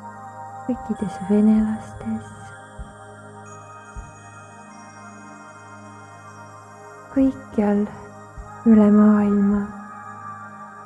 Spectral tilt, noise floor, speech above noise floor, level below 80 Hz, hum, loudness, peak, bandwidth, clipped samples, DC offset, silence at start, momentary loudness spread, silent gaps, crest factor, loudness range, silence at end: -8.5 dB/octave; -42 dBFS; 23 dB; -48 dBFS; none; -20 LUFS; -4 dBFS; 9.6 kHz; under 0.1%; under 0.1%; 0 s; 25 LU; none; 18 dB; 21 LU; 0 s